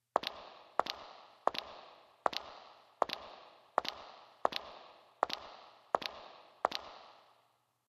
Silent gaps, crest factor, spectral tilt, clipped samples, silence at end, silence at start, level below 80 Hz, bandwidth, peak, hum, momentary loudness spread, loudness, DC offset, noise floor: none; 30 dB; -2 dB/octave; under 0.1%; 0.7 s; 0.15 s; -76 dBFS; 14 kHz; -12 dBFS; none; 18 LU; -39 LUFS; under 0.1%; -75 dBFS